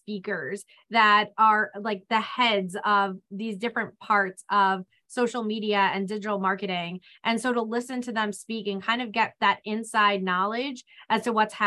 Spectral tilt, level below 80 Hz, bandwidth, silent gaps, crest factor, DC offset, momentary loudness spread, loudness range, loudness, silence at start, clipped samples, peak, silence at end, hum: -4 dB/octave; -76 dBFS; 12.5 kHz; none; 18 dB; under 0.1%; 11 LU; 4 LU; -25 LUFS; 0.1 s; under 0.1%; -8 dBFS; 0 s; none